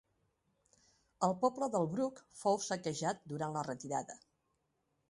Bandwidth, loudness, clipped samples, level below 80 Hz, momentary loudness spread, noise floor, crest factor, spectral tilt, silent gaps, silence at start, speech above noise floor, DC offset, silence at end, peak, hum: 11.5 kHz; -37 LUFS; under 0.1%; -76 dBFS; 7 LU; -81 dBFS; 20 dB; -5 dB/octave; none; 1.2 s; 45 dB; under 0.1%; 0.95 s; -18 dBFS; none